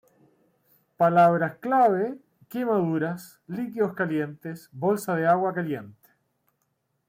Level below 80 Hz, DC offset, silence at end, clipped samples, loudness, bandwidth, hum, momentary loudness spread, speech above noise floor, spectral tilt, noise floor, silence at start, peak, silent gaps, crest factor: -72 dBFS; under 0.1%; 1.2 s; under 0.1%; -25 LUFS; 16.5 kHz; none; 16 LU; 51 dB; -7.5 dB/octave; -75 dBFS; 1 s; -10 dBFS; none; 16 dB